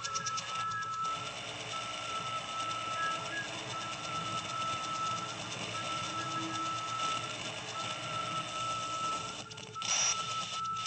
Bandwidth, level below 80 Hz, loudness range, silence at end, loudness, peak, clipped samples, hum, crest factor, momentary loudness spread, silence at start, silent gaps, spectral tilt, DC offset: 9 kHz; -70 dBFS; 2 LU; 0 s; -35 LUFS; -20 dBFS; under 0.1%; none; 18 dB; 4 LU; 0 s; none; -1.5 dB/octave; under 0.1%